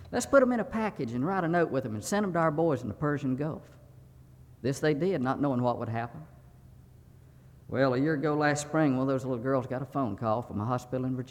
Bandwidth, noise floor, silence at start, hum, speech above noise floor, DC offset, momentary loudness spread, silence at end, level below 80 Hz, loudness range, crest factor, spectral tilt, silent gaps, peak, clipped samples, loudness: 16 kHz; -54 dBFS; 0 s; none; 25 dB; under 0.1%; 8 LU; 0.05 s; -60 dBFS; 3 LU; 20 dB; -6.5 dB/octave; none; -10 dBFS; under 0.1%; -29 LUFS